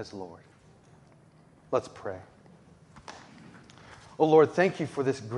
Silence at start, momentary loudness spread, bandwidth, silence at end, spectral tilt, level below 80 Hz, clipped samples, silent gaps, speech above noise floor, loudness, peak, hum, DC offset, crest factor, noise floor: 0 s; 27 LU; 10.5 kHz; 0 s; -6.5 dB/octave; -68 dBFS; under 0.1%; none; 31 dB; -26 LUFS; -8 dBFS; none; under 0.1%; 22 dB; -58 dBFS